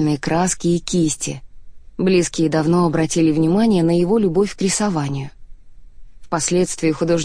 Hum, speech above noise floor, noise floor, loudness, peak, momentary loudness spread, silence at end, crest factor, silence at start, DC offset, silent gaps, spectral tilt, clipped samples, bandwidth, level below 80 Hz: none; 20 dB; -37 dBFS; -18 LUFS; -6 dBFS; 10 LU; 0 s; 12 dB; 0 s; under 0.1%; none; -5.5 dB/octave; under 0.1%; 10.5 kHz; -42 dBFS